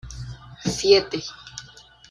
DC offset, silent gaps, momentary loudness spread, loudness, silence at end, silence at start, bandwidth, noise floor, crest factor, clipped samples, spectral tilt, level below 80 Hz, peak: under 0.1%; none; 21 LU; -21 LUFS; 0.5 s; 0.05 s; 11.5 kHz; -48 dBFS; 22 dB; under 0.1%; -4 dB/octave; -46 dBFS; -4 dBFS